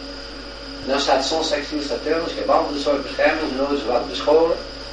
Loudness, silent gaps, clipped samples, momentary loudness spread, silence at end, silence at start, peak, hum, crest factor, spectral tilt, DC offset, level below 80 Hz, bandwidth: -21 LUFS; none; under 0.1%; 14 LU; 0 s; 0 s; -4 dBFS; none; 18 dB; -3.5 dB/octave; under 0.1%; -42 dBFS; 10 kHz